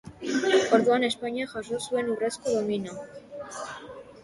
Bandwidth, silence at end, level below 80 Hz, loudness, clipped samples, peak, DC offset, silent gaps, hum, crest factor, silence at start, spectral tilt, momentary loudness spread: 11.5 kHz; 0 s; -64 dBFS; -26 LUFS; under 0.1%; -8 dBFS; under 0.1%; none; none; 20 dB; 0.05 s; -4 dB/octave; 20 LU